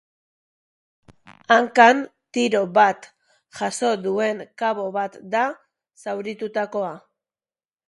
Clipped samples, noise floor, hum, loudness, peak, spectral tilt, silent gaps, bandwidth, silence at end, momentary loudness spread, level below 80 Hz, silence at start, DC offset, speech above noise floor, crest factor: under 0.1%; under -90 dBFS; none; -21 LUFS; -2 dBFS; -4 dB/octave; none; 11.5 kHz; 0.9 s; 15 LU; -72 dBFS; 1.3 s; under 0.1%; over 70 dB; 22 dB